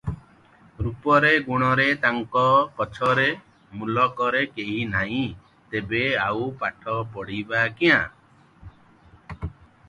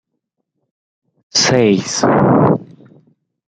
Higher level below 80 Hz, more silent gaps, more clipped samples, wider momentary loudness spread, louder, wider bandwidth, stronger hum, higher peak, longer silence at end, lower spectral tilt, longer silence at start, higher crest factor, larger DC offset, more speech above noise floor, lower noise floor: about the same, -48 dBFS vs -52 dBFS; neither; neither; first, 16 LU vs 5 LU; second, -22 LUFS vs -13 LUFS; first, 11 kHz vs 9.4 kHz; neither; second, -4 dBFS vs 0 dBFS; second, 0.4 s vs 0.85 s; first, -6.5 dB/octave vs -4.5 dB/octave; second, 0.05 s vs 1.35 s; about the same, 20 dB vs 16 dB; neither; second, 31 dB vs 62 dB; second, -54 dBFS vs -74 dBFS